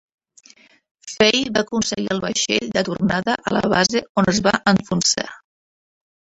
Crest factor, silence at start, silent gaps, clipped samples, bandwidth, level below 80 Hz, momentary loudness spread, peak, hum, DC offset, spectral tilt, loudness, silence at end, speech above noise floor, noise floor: 20 dB; 1.05 s; 4.09-4.15 s; under 0.1%; 8.4 kHz; -52 dBFS; 7 LU; -2 dBFS; none; under 0.1%; -3.5 dB/octave; -19 LUFS; 0.9 s; over 71 dB; under -90 dBFS